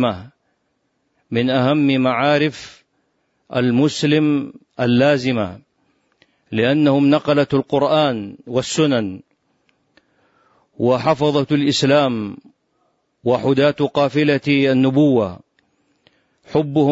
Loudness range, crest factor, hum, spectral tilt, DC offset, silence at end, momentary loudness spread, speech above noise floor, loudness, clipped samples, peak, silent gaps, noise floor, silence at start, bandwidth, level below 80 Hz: 3 LU; 14 dB; none; -6 dB/octave; under 0.1%; 0 s; 11 LU; 52 dB; -17 LUFS; under 0.1%; -4 dBFS; none; -68 dBFS; 0 s; 8 kHz; -58 dBFS